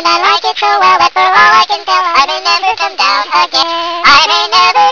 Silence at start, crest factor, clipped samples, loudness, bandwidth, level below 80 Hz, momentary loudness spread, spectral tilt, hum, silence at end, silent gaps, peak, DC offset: 0 s; 8 dB; 1%; -8 LUFS; 5.4 kHz; -46 dBFS; 6 LU; -0.5 dB/octave; none; 0 s; none; 0 dBFS; under 0.1%